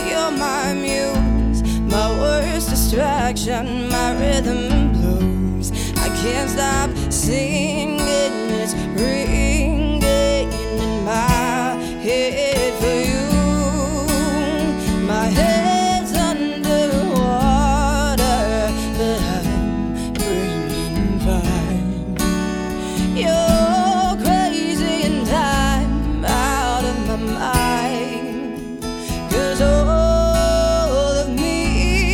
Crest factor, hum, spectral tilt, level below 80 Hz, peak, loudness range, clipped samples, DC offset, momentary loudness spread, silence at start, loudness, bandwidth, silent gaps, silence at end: 16 dB; none; -5 dB/octave; -24 dBFS; -2 dBFS; 3 LU; under 0.1%; under 0.1%; 6 LU; 0 s; -19 LUFS; 18 kHz; none; 0 s